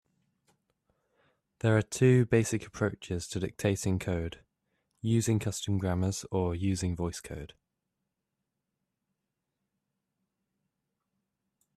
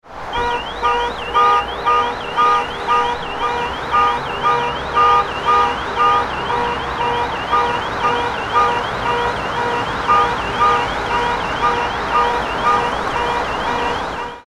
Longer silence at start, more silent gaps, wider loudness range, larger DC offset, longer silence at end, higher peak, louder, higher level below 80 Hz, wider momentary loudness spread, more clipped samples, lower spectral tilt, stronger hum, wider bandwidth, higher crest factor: first, 1.65 s vs 0.05 s; neither; first, 8 LU vs 2 LU; neither; first, 4.3 s vs 0.05 s; second, -12 dBFS vs -2 dBFS; second, -30 LUFS vs -17 LUFS; second, -58 dBFS vs -38 dBFS; first, 13 LU vs 5 LU; neither; first, -6 dB/octave vs -4 dB/octave; neither; about the same, 13.5 kHz vs 13 kHz; about the same, 20 dB vs 16 dB